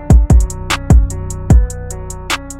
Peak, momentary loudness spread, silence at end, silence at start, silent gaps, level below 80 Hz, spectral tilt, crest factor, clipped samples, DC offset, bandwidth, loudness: 0 dBFS; 16 LU; 0 s; 0 s; none; -14 dBFS; -5.5 dB/octave; 12 dB; under 0.1%; under 0.1%; 13.5 kHz; -14 LUFS